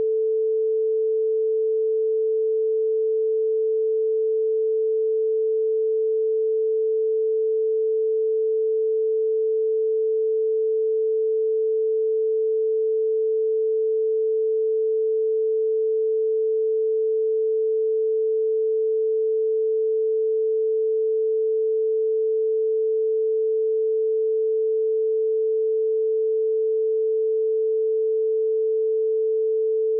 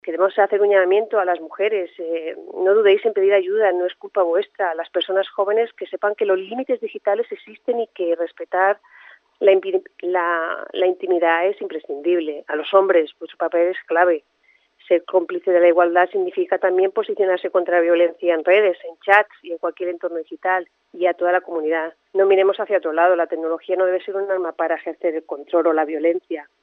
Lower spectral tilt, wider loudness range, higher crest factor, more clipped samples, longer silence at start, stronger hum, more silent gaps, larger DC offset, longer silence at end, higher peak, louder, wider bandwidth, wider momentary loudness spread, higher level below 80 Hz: first, -9.5 dB/octave vs -6 dB/octave; second, 0 LU vs 4 LU; second, 4 dB vs 20 dB; neither; about the same, 0 s vs 0.05 s; neither; neither; neither; second, 0 s vs 0.2 s; second, -18 dBFS vs 0 dBFS; about the same, -22 LUFS vs -20 LUFS; second, 0.5 kHz vs 4.1 kHz; second, 0 LU vs 10 LU; about the same, under -90 dBFS vs -86 dBFS